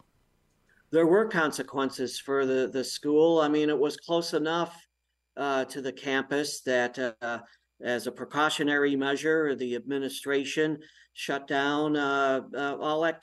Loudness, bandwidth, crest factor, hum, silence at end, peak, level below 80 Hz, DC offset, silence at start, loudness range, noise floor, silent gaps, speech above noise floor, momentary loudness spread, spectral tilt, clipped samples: -28 LUFS; 12.5 kHz; 18 dB; none; 0.05 s; -12 dBFS; -76 dBFS; under 0.1%; 0.9 s; 4 LU; -69 dBFS; none; 42 dB; 10 LU; -4 dB/octave; under 0.1%